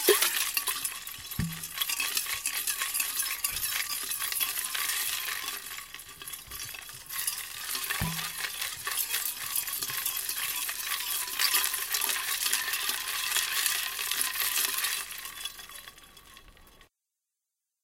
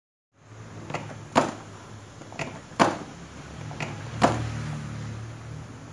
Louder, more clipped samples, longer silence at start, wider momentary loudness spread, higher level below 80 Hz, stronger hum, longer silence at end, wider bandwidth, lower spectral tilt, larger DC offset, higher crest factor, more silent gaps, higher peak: about the same, -29 LUFS vs -29 LUFS; neither; second, 0 s vs 0.4 s; second, 12 LU vs 19 LU; second, -58 dBFS vs -52 dBFS; neither; first, 1 s vs 0 s; first, 17 kHz vs 11.5 kHz; second, -0.5 dB/octave vs -5 dB/octave; neither; about the same, 26 dB vs 28 dB; neither; second, -6 dBFS vs -2 dBFS